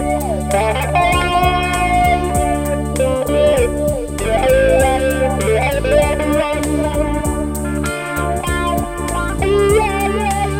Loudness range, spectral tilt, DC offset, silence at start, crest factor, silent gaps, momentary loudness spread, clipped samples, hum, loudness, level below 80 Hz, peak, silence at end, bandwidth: 3 LU; -5 dB/octave; under 0.1%; 0 s; 14 dB; none; 7 LU; under 0.1%; none; -16 LUFS; -24 dBFS; 0 dBFS; 0 s; 17 kHz